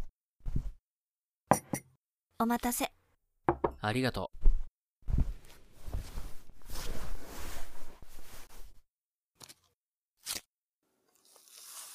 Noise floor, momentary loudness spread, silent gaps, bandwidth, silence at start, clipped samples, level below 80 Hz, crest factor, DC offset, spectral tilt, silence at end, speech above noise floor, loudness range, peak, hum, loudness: under -90 dBFS; 23 LU; 0.24-0.32 s, 0.96-1.00 s, 1.11-1.15 s, 4.88-4.96 s, 9.75-9.81 s, 10.46-10.50 s; 15.5 kHz; 0 s; under 0.1%; -38 dBFS; 28 dB; under 0.1%; -4.5 dB/octave; 0 s; over 58 dB; 14 LU; -6 dBFS; none; -36 LUFS